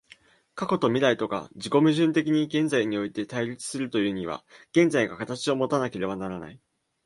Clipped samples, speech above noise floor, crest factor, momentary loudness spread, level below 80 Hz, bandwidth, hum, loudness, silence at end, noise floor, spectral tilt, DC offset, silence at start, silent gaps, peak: under 0.1%; 31 dB; 18 dB; 12 LU; -64 dBFS; 11.5 kHz; none; -26 LUFS; 0.5 s; -56 dBFS; -5.5 dB/octave; under 0.1%; 0.55 s; none; -8 dBFS